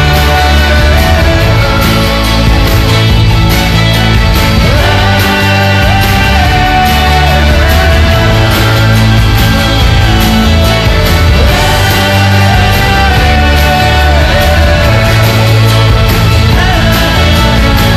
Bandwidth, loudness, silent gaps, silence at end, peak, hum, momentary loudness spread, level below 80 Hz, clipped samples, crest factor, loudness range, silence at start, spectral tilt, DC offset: 15 kHz; -7 LUFS; none; 0 s; 0 dBFS; none; 1 LU; -12 dBFS; 0.6%; 6 dB; 1 LU; 0 s; -5 dB/octave; under 0.1%